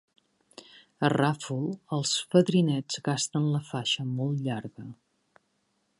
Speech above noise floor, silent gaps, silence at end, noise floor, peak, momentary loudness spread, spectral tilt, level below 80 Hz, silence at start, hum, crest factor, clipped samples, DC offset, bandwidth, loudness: 46 dB; none; 1.05 s; -74 dBFS; -8 dBFS; 10 LU; -5 dB/octave; -72 dBFS; 1 s; none; 22 dB; under 0.1%; under 0.1%; 11.5 kHz; -28 LUFS